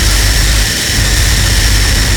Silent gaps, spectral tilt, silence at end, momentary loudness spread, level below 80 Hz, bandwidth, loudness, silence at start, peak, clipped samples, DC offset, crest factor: none; -2.5 dB/octave; 0 s; 1 LU; -12 dBFS; over 20 kHz; -10 LUFS; 0 s; 0 dBFS; under 0.1%; under 0.1%; 10 dB